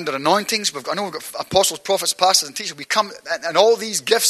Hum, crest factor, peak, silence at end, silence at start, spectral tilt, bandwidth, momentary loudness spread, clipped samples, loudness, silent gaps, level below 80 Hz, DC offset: none; 20 dB; 0 dBFS; 0 s; 0 s; -1.5 dB/octave; 13 kHz; 10 LU; under 0.1%; -19 LUFS; none; -58 dBFS; under 0.1%